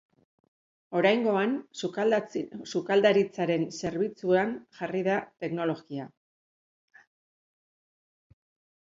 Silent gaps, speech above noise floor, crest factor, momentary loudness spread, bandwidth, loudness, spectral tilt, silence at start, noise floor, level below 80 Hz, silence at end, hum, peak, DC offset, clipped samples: none; over 63 dB; 22 dB; 12 LU; 7.8 kHz; -28 LUFS; -5.5 dB/octave; 0.9 s; under -90 dBFS; -70 dBFS; 2.75 s; none; -8 dBFS; under 0.1%; under 0.1%